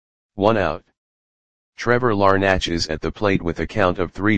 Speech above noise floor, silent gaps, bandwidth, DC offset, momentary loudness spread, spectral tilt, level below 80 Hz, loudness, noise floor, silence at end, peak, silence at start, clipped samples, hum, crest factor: over 71 dB; 0.98-1.73 s; 9.8 kHz; 1%; 8 LU; -5.5 dB/octave; -40 dBFS; -20 LUFS; under -90 dBFS; 0 s; 0 dBFS; 0.3 s; under 0.1%; none; 20 dB